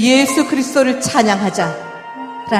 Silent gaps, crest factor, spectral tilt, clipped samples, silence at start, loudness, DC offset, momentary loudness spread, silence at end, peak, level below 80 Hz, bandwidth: none; 16 dB; -3.5 dB/octave; under 0.1%; 0 s; -15 LUFS; under 0.1%; 16 LU; 0 s; 0 dBFS; -56 dBFS; 15 kHz